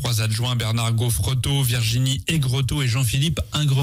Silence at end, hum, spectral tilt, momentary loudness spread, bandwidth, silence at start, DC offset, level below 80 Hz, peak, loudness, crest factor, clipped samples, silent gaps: 0 s; none; -4.5 dB/octave; 2 LU; 16 kHz; 0 s; under 0.1%; -38 dBFS; -10 dBFS; -21 LUFS; 10 dB; under 0.1%; none